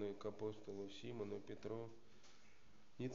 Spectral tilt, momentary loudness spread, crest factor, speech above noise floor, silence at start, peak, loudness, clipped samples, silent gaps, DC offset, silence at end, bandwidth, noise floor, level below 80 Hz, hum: -6 dB/octave; 19 LU; 16 dB; 21 dB; 0 s; -34 dBFS; -51 LUFS; under 0.1%; none; 0.2%; 0 s; 7.4 kHz; -71 dBFS; -80 dBFS; none